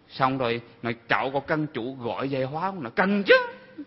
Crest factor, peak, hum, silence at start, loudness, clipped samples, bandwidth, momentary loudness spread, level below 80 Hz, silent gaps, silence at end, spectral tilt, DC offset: 20 dB; -4 dBFS; none; 0.1 s; -25 LUFS; under 0.1%; 5.8 kHz; 12 LU; -62 dBFS; none; 0 s; -9 dB/octave; under 0.1%